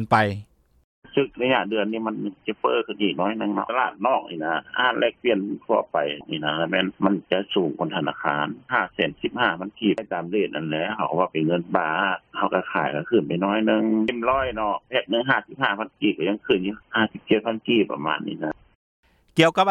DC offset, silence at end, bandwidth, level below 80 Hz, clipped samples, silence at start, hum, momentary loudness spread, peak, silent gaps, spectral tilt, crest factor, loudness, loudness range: under 0.1%; 0 s; 10 kHz; -58 dBFS; under 0.1%; 0 s; none; 6 LU; -2 dBFS; 0.84-1.02 s, 18.75-19.03 s; -6.5 dB/octave; 22 dB; -24 LUFS; 2 LU